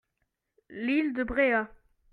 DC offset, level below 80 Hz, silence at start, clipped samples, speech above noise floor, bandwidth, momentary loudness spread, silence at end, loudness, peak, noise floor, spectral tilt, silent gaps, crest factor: under 0.1%; -54 dBFS; 0.7 s; under 0.1%; 53 dB; 4.6 kHz; 15 LU; 0.45 s; -28 LUFS; -12 dBFS; -80 dBFS; -7 dB/octave; none; 18 dB